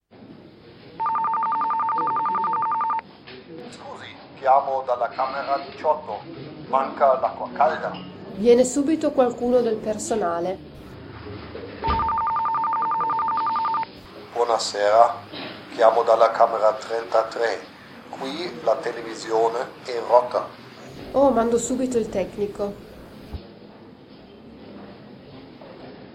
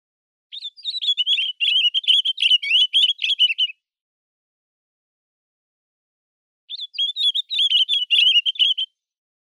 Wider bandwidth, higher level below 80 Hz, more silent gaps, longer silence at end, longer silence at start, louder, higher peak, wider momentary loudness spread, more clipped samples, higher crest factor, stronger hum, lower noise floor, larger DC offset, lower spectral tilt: first, 15 kHz vs 12 kHz; first, -50 dBFS vs under -90 dBFS; second, none vs 4.01-6.68 s; second, 0 s vs 0.6 s; second, 0.15 s vs 0.55 s; second, -22 LUFS vs -16 LUFS; first, -2 dBFS vs -6 dBFS; first, 23 LU vs 15 LU; neither; first, 22 dB vs 16 dB; neither; second, -46 dBFS vs under -90 dBFS; neither; first, -4.5 dB/octave vs 13 dB/octave